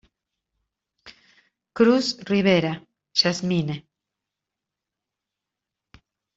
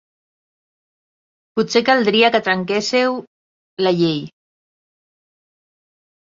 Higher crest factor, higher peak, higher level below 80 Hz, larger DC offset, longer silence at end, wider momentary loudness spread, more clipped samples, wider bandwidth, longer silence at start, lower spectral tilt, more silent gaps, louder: about the same, 22 dB vs 20 dB; second, -6 dBFS vs -2 dBFS; about the same, -64 dBFS vs -64 dBFS; neither; first, 2.55 s vs 2.1 s; first, 16 LU vs 13 LU; neither; about the same, 8 kHz vs 7.6 kHz; second, 1.05 s vs 1.55 s; about the same, -5 dB/octave vs -4.5 dB/octave; second, none vs 3.27-3.77 s; second, -22 LUFS vs -17 LUFS